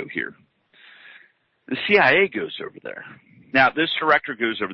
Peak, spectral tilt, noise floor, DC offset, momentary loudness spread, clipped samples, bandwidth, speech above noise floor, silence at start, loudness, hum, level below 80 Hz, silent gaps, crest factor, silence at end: -4 dBFS; -6.5 dB/octave; -58 dBFS; under 0.1%; 18 LU; under 0.1%; 6.2 kHz; 37 dB; 0 s; -20 LUFS; none; -64 dBFS; none; 18 dB; 0 s